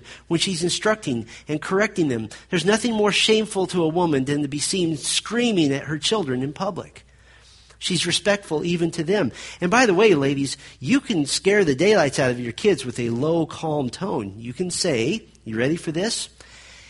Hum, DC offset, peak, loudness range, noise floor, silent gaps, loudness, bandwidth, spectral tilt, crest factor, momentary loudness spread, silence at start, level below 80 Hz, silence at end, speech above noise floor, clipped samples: none; under 0.1%; -2 dBFS; 5 LU; -51 dBFS; none; -22 LUFS; 11.5 kHz; -4 dB/octave; 20 dB; 11 LU; 0 s; -54 dBFS; 0.1 s; 29 dB; under 0.1%